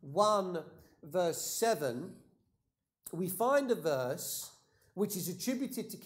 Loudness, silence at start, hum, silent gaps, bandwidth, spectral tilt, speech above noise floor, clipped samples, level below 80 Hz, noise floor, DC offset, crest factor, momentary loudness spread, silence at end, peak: -34 LUFS; 0.05 s; none; none; 16 kHz; -4 dB/octave; 50 dB; under 0.1%; -78 dBFS; -83 dBFS; under 0.1%; 20 dB; 16 LU; 0 s; -14 dBFS